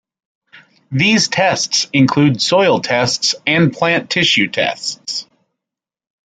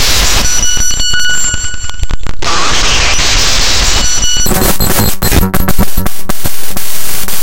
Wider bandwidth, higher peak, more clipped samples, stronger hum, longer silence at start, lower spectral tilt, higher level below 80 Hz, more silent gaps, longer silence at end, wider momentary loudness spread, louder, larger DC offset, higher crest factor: second, 9.4 kHz vs 17.5 kHz; about the same, -2 dBFS vs 0 dBFS; second, under 0.1% vs 0.4%; neither; first, 0.55 s vs 0 s; first, -4 dB/octave vs -2 dB/octave; second, -56 dBFS vs -16 dBFS; neither; first, 1.05 s vs 0 s; about the same, 10 LU vs 9 LU; second, -14 LUFS vs -11 LUFS; neither; first, 16 dB vs 6 dB